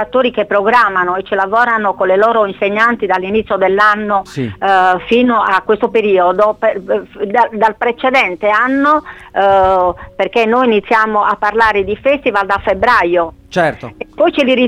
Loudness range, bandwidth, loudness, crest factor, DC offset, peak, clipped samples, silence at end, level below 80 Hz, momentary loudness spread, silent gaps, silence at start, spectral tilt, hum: 1 LU; 12.5 kHz; -12 LUFS; 12 dB; under 0.1%; 0 dBFS; under 0.1%; 0 s; -42 dBFS; 6 LU; none; 0 s; -5.5 dB/octave; none